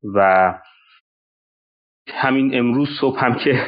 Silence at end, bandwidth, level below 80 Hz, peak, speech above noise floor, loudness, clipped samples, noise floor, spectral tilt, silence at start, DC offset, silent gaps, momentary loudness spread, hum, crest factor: 0 s; 5.2 kHz; -62 dBFS; -2 dBFS; over 73 dB; -17 LUFS; under 0.1%; under -90 dBFS; -4.5 dB/octave; 0.05 s; under 0.1%; 1.00-2.05 s; 7 LU; none; 16 dB